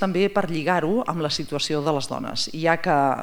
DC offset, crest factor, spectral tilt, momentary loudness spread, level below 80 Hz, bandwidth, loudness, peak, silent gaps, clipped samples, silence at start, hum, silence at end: under 0.1%; 18 dB; -5 dB/octave; 6 LU; -54 dBFS; over 20 kHz; -23 LUFS; -4 dBFS; none; under 0.1%; 0 s; none; 0 s